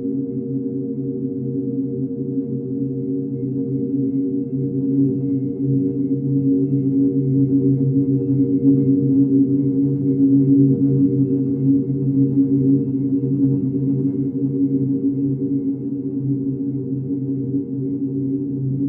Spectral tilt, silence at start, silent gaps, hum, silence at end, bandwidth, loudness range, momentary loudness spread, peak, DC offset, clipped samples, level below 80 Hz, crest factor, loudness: -16 dB/octave; 0 s; none; none; 0 s; 1 kHz; 7 LU; 8 LU; -4 dBFS; under 0.1%; under 0.1%; -56 dBFS; 14 dB; -19 LUFS